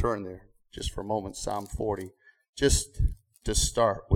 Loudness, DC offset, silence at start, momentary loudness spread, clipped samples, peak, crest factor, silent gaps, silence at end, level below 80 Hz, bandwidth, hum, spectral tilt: -29 LUFS; under 0.1%; 0 s; 18 LU; under 0.1%; -10 dBFS; 20 dB; 2.49-2.53 s; 0 s; -36 dBFS; 17 kHz; none; -4 dB/octave